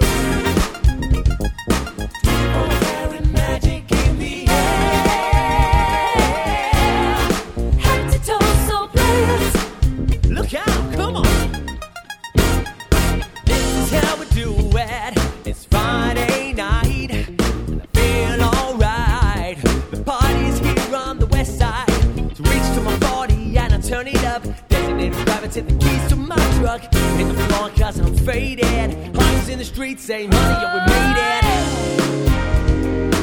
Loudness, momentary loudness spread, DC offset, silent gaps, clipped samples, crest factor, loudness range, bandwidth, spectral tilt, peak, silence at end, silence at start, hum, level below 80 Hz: -18 LUFS; 5 LU; under 0.1%; none; under 0.1%; 16 dB; 3 LU; over 20 kHz; -5 dB/octave; 0 dBFS; 0 s; 0 s; none; -20 dBFS